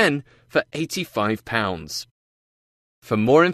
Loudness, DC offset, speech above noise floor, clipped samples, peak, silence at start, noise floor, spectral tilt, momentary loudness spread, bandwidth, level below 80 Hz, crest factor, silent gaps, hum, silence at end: -23 LUFS; under 0.1%; over 68 dB; under 0.1%; -4 dBFS; 0 s; under -90 dBFS; -5 dB/octave; 13 LU; 14 kHz; -56 dBFS; 20 dB; 2.11-3.02 s; none; 0 s